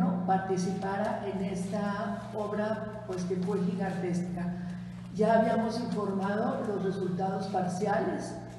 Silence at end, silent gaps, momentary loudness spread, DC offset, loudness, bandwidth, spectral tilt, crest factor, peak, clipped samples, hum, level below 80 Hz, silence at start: 0 s; none; 8 LU; under 0.1%; -31 LUFS; 12 kHz; -7 dB/octave; 16 dB; -14 dBFS; under 0.1%; none; -60 dBFS; 0 s